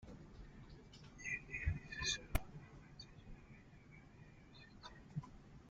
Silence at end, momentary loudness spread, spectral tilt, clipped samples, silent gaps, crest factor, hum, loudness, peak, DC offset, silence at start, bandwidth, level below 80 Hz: 0 s; 20 LU; -3 dB/octave; under 0.1%; none; 28 dB; none; -46 LUFS; -20 dBFS; under 0.1%; 0 s; 9.6 kHz; -54 dBFS